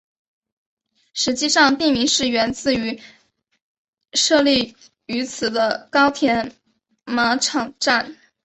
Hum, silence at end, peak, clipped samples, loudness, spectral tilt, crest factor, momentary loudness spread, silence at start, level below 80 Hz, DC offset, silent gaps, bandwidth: none; 0.3 s; -2 dBFS; under 0.1%; -19 LUFS; -2 dB/octave; 18 dB; 13 LU; 1.15 s; -54 dBFS; under 0.1%; 3.62-3.93 s; 8.4 kHz